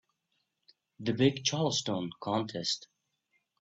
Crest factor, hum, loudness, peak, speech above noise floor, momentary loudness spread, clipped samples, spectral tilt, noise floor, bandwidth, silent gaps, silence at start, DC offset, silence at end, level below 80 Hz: 22 dB; none; -31 LUFS; -12 dBFS; 49 dB; 8 LU; under 0.1%; -4.5 dB/octave; -80 dBFS; 8.4 kHz; none; 1 s; under 0.1%; 0.8 s; -72 dBFS